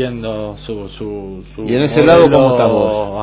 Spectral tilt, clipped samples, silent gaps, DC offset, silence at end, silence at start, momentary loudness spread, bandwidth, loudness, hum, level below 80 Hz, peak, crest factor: -11 dB/octave; 0.2%; none; under 0.1%; 0 s; 0 s; 19 LU; 4 kHz; -12 LUFS; none; -38 dBFS; 0 dBFS; 14 dB